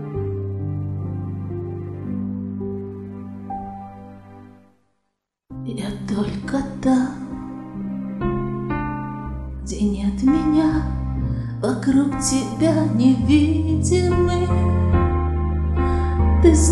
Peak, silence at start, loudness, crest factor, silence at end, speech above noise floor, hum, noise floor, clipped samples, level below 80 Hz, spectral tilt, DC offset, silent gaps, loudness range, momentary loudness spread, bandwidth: -2 dBFS; 0 s; -21 LUFS; 18 dB; 0 s; 58 dB; none; -76 dBFS; under 0.1%; -28 dBFS; -6.5 dB/octave; 0.1%; none; 13 LU; 15 LU; 12 kHz